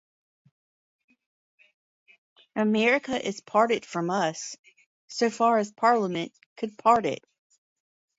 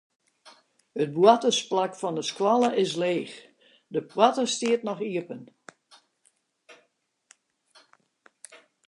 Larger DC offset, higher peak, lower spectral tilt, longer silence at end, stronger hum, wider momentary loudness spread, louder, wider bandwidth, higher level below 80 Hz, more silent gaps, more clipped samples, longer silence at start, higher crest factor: neither; second, -8 dBFS vs -4 dBFS; about the same, -4.5 dB/octave vs -4 dB/octave; first, 1.05 s vs 0.3 s; neither; about the same, 15 LU vs 17 LU; about the same, -25 LUFS vs -25 LUFS; second, 8 kHz vs 11.5 kHz; first, -72 dBFS vs -82 dBFS; first, 4.59-4.64 s, 4.86-5.08 s, 6.46-6.56 s vs none; neither; first, 2.55 s vs 0.95 s; about the same, 20 dB vs 24 dB